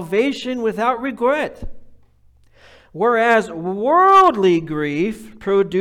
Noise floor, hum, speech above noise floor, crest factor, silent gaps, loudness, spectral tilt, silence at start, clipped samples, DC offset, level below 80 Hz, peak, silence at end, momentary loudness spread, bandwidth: -52 dBFS; none; 35 dB; 14 dB; none; -17 LUFS; -6 dB/octave; 0 s; under 0.1%; under 0.1%; -44 dBFS; -4 dBFS; 0 s; 11 LU; 13.5 kHz